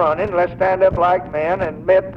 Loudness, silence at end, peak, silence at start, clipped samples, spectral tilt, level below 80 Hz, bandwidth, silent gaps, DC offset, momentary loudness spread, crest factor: -17 LUFS; 0 s; -2 dBFS; 0 s; under 0.1%; -8 dB/octave; -40 dBFS; 5.6 kHz; none; under 0.1%; 6 LU; 14 dB